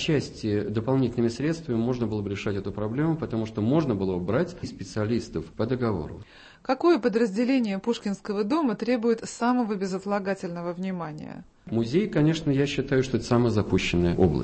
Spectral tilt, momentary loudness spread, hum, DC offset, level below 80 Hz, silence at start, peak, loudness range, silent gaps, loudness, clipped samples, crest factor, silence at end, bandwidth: -7 dB/octave; 9 LU; none; under 0.1%; -48 dBFS; 0 s; -8 dBFS; 3 LU; none; -26 LUFS; under 0.1%; 18 dB; 0 s; 8.8 kHz